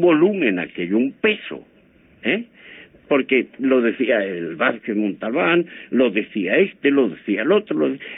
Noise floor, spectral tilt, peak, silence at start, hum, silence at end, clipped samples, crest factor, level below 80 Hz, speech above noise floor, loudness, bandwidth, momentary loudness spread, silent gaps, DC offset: -53 dBFS; -10 dB/octave; -6 dBFS; 0 s; none; 0 s; under 0.1%; 14 dB; -66 dBFS; 33 dB; -20 LUFS; 3.9 kHz; 7 LU; none; under 0.1%